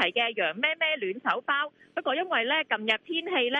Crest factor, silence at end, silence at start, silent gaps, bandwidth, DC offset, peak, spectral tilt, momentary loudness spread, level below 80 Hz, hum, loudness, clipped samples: 18 dB; 0 s; 0 s; none; 8.2 kHz; under 0.1%; -10 dBFS; -4 dB/octave; 4 LU; -78 dBFS; none; -27 LUFS; under 0.1%